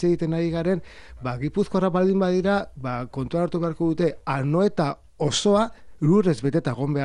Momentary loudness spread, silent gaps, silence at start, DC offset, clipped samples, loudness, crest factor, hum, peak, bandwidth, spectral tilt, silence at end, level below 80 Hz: 9 LU; none; 0 s; under 0.1%; under 0.1%; -23 LUFS; 14 dB; none; -8 dBFS; 10.5 kHz; -6.5 dB/octave; 0 s; -50 dBFS